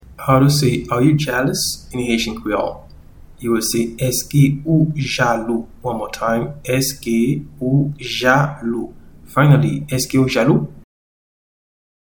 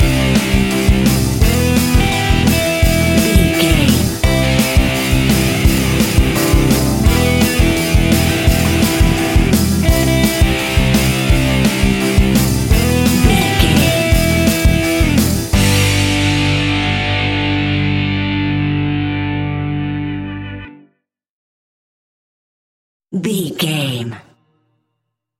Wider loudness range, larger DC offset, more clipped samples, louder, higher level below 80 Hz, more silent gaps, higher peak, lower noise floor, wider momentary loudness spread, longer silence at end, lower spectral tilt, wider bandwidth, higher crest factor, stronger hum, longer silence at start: second, 2 LU vs 10 LU; neither; neither; second, -17 LUFS vs -14 LUFS; second, -42 dBFS vs -20 dBFS; second, none vs 21.30-23.00 s; about the same, 0 dBFS vs 0 dBFS; second, -40 dBFS vs -74 dBFS; first, 10 LU vs 7 LU; about the same, 1.3 s vs 1.2 s; about the same, -5.5 dB/octave vs -5 dB/octave; first, 19.5 kHz vs 17 kHz; about the same, 18 dB vs 14 dB; neither; about the same, 0.05 s vs 0 s